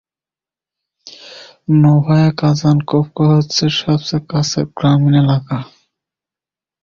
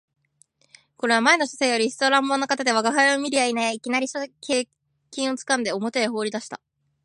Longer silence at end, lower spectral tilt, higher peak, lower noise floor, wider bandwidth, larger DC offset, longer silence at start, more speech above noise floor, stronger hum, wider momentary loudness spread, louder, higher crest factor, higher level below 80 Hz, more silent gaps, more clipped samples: first, 1.2 s vs 0.5 s; first, -6.5 dB/octave vs -2 dB/octave; about the same, -2 dBFS vs -4 dBFS; first, under -90 dBFS vs -62 dBFS; second, 7.4 kHz vs 11.5 kHz; neither; about the same, 1.05 s vs 1.05 s; first, over 77 dB vs 40 dB; neither; about the same, 13 LU vs 11 LU; first, -14 LUFS vs -22 LUFS; second, 14 dB vs 20 dB; first, -48 dBFS vs -76 dBFS; neither; neither